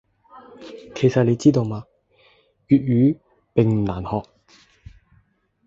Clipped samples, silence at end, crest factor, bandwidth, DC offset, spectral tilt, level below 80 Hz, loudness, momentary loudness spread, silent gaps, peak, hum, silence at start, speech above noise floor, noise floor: under 0.1%; 1.45 s; 20 dB; 7.8 kHz; under 0.1%; -8.5 dB/octave; -48 dBFS; -20 LUFS; 19 LU; none; -2 dBFS; none; 0.35 s; 43 dB; -62 dBFS